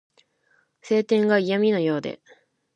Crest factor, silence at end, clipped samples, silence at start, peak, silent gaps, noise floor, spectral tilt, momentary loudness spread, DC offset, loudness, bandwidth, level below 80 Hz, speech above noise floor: 18 dB; 0.65 s; under 0.1%; 0.85 s; -6 dBFS; none; -66 dBFS; -6.5 dB/octave; 12 LU; under 0.1%; -22 LUFS; 9 kHz; -74 dBFS; 44 dB